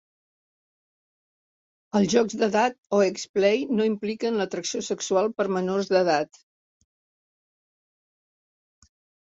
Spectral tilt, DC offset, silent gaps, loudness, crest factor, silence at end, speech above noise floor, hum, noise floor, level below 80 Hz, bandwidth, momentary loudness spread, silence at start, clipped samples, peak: -4.5 dB/octave; under 0.1%; 2.78-2.83 s, 3.29-3.34 s; -24 LUFS; 20 dB; 3.1 s; over 66 dB; none; under -90 dBFS; -70 dBFS; 8 kHz; 6 LU; 1.95 s; under 0.1%; -8 dBFS